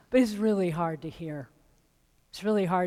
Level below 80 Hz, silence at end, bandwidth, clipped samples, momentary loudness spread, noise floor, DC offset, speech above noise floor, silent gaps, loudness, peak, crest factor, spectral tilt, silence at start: -60 dBFS; 0 s; 15.5 kHz; under 0.1%; 16 LU; -67 dBFS; under 0.1%; 40 dB; none; -29 LUFS; -12 dBFS; 18 dB; -7 dB/octave; 0.1 s